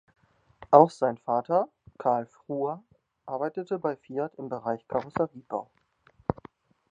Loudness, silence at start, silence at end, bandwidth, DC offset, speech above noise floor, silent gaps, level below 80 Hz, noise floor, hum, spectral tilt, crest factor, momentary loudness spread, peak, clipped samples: -28 LUFS; 0.6 s; 0.6 s; 9.6 kHz; under 0.1%; 36 dB; none; -60 dBFS; -63 dBFS; none; -8 dB/octave; 26 dB; 16 LU; -2 dBFS; under 0.1%